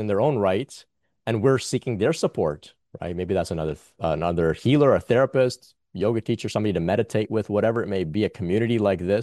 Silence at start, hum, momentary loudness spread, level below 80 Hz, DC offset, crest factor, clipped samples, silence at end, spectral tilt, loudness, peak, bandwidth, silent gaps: 0 s; none; 10 LU; -54 dBFS; under 0.1%; 16 dB; under 0.1%; 0 s; -6.5 dB/octave; -23 LUFS; -6 dBFS; 12.5 kHz; none